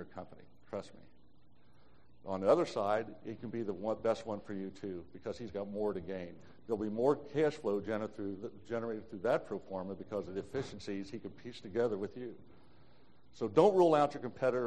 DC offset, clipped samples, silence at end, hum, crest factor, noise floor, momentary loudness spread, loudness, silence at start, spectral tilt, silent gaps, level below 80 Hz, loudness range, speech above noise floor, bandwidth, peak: 0.2%; under 0.1%; 0 s; none; 22 dB; -67 dBFS; 16 LU; -36 LUFS; 0 s; -7 dB/octave; none; -68 dBFS; 7 LU; 32 dB; 9.4 kHz; -14 dBFS